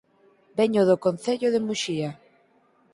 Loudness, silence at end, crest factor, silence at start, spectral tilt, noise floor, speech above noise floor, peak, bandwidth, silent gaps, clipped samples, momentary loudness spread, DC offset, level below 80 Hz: -24 LUFS; 0.8 s; 18 dB; 0.55 s; -5.5 dB/octave; -62 dBFS; 39 dB; -8 dBFS; 11.5 kHz; none; under 0.1%; 11 LU; under 0.1%; -68 dBFS